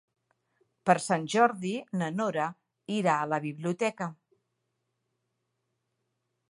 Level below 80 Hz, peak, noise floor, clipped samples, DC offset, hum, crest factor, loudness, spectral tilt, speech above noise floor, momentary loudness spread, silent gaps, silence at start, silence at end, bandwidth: -80 dBFS; -6 dBFS; -81 dBFS; under 0.1%; under 0.1%; none; 26 dB; -29 LUFS; -5.5 dB/octave; 52 dB; 10 LU; none; 0.85 s; 2.35 s; 11.5 kHz